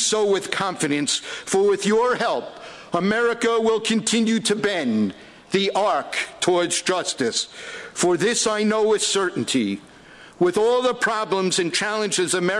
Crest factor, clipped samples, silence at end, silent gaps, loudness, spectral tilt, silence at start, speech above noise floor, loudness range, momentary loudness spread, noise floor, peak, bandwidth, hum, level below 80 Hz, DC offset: 16 dB; under 0.1%; 0 s; none; -21 LUFS; -3 dB/octave; 0 s; 24 dB; 1 LU; 6 LU; -45 dBFS; -6 dBFS; 12 kHz; none; -62 dBFS; under 0.1%